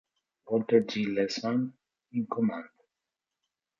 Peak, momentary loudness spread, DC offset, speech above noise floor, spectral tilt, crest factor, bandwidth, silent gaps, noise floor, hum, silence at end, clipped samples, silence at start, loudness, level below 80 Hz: -10 dBFS; 11 LU; under 0.1%; 60 dB; -6 dB/octave; 22 dB; 7.4 kHz; none; -88 dBFS; none; 1.15 s; under 0.1%; 0.45 s; -30 LUFS; -74 dBFS